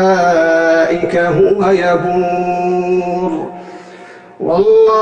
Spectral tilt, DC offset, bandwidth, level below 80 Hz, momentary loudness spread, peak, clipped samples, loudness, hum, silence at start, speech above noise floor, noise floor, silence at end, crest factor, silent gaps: -6.5 dB/octave; under 0.1%; 8.8 kHz; -48 dBFS; 12 LU; -2 dBFS; under 0.1%; -13 LUFS; none; 0 s; 24 dB; -35 dBFS; 0 s; 10 dB; none